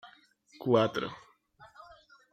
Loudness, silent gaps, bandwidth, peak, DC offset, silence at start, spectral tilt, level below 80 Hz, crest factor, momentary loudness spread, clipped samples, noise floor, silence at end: -30 LUFS; none; 15.5 kHz; -12 dBFS; under 0.1%; 0.05 s; -6.5 dB/octave; -72 dBFS; 22 dB; 26 LU; under 0.1%; -61 dBFS; 0.65 s